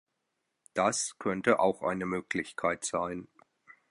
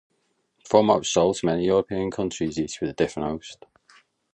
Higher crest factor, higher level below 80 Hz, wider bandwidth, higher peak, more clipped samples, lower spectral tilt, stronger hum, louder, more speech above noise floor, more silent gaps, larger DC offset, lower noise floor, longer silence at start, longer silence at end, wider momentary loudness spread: about the same, 22 dB vs 22 dB; second, -66 dBFS vs -52 dBFS; first, 11.5 kHz vs 10 kHz; second, -10 dBFS vs -2 dBFS; neither; about the same, -4 dB/octave vs -5 dB/octave; neither; second, -31 LUFS vs -23 LUFS; first, 52 dB vs 48 dB; neither; neither; first, -82 dBFS vs -71 dBFS; about the same, 0.75 s vs 0.65 s; second, 0.65 s vs 0.8 s; about the same, 9 LU vs 11 LU